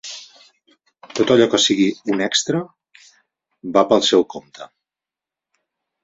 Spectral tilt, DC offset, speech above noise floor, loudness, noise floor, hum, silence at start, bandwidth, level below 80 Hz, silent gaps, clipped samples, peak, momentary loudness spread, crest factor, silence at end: -3.5 dB/octave; under 0.1%; 71 dB; -17 LUFS; -88 dBFS; none; 0.05 s; 8 kHz; -62 dBFS; none; under 0.1%; -2 dBFS; 21 LU; 20 dB; 1.4 s